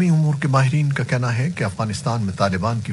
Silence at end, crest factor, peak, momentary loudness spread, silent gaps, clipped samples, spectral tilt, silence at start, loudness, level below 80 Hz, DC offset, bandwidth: 0 s; 16 dB; -4 dBFS; 6 LU; none; under 0.1%; -6.5 dB/octave; 0 s; -20 LUFS; -52 dBFS; under 0.1%; 11.5 kHz